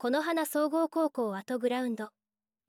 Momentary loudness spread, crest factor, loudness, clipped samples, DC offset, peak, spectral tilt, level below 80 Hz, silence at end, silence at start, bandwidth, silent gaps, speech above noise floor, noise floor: 7 LU; 14 dB; -31 LUFS; under 0.1%; under 0.1%; -18 dBFS; -4.5 dB/octave; -88 dBFS; 0.6 s; 0 s; 17.5 kHz; none; over 60 dB; under -90 dBFS